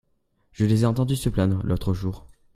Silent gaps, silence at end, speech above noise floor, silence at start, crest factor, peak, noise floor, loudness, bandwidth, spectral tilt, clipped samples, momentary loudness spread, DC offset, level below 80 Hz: none; 0.35 s; 43 dB; 0.6 s; 18 dB; -6 dBFS; -66 dBFS; -24 LUFS; 15 kHz; -7.5 dB/octave; under 0.1%; 9 LU; under 0.1%; -40 dBFS